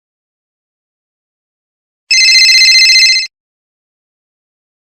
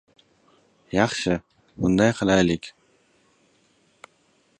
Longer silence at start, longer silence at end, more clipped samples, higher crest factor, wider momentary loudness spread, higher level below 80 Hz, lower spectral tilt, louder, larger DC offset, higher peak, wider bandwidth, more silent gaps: first, 2.1 s vs 0.95 s; second, 1.75 s vs 1.9 s; first, 0.2% vs under 0.1%; second, 12 dB vs 22 dB; about the same, 9 LU vs 10 LU; second, -62 dBFS vs -50 dBFS; second, 6.5 dB/octave vs -5.5 dB/octave; first, -4 LUFS vs -22 LUFS; neither; first, 0 dBFS vs -4 dBFS; first, over 20 kHz vs 11 kHz; neither